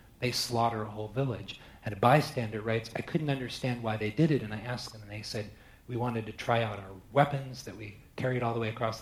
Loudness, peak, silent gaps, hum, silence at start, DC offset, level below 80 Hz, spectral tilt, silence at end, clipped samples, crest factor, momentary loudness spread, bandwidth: -32 LUFS; -8 dBFS; none; none; 0.2 s; under 0.1%; -58 dBFS; -6 dB/octave; 0 s; under 0.1%; 24 dB; 14 LU; 15.5 kHz